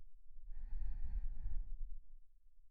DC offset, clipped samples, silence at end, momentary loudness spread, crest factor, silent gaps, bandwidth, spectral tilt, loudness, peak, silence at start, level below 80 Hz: under 0.1%; under 0.1%; 0 s; 14 LU; 12 dB; none; 1.9 kHz; -9 dB/octave; -51 LUFS; -28 dBFS; 0 s; -44 dBFS